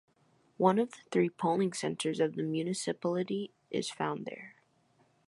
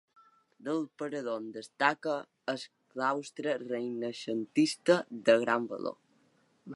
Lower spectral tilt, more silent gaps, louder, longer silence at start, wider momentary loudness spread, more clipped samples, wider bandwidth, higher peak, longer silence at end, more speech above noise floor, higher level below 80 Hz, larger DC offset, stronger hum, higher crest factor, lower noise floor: about the same, -5.5 dB/octave vs -4.5 dB/octave; neither; about the same, -33 LUFS vs -32 LUFS; about the same, 0.6 s vs 0.6 s; second, 10 LU vs 13 LU; neither; about the same, 11.5 kHz vs 11.5 kHz; about the same, -10 dBFS vs -10 dBFS; first, 0.8 s vs 0 s; about the same, 38 dB vs 37 dB; first, -80 dBFS vs -86 dBFS; neither; neither; about the same, 22 dB vs 24 dB; about the same, -70 dBFS vs -69 dBFS